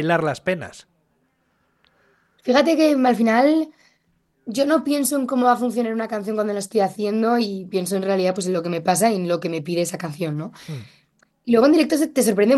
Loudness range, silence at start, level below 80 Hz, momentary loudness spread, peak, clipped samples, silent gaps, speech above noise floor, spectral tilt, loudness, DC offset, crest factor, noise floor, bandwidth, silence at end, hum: 3 LU; 0 s; -66 dBFS; 13 LU; -4 dBFS; under 0.1%; none; 47 dB; -5 dB/octave; -20 LUFS; under 0.1%; 18 dB; -67 dBFS; 13 kHz; 0 s; none